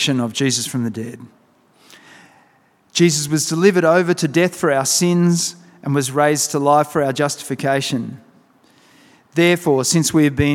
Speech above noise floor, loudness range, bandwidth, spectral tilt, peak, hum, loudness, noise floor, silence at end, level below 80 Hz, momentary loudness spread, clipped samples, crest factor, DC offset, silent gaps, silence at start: 40 dB; 4 LU; 17 kHz; -4.5 dB/octave; 0 dBFS; none; -17 LUFS; -56 dBFS; 0 s; -52 dBFS; 9 LU; under 0.1%; 18 dB; under 0.1%; none; 0 s